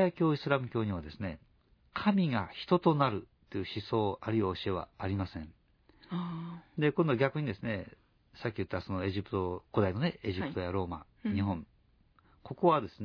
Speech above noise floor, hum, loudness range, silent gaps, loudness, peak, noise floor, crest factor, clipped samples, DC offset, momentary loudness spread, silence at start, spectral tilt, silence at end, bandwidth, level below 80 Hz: 34 dB; none; 4 LU; none; -33 LUFS; -12 dBFS; -67 dBFS; 22 dB; under 0.1%; under 0.1%; 13 LU; 0 s; -9 dB/octave; 0 s; 5.4 kHz; -60 dBFS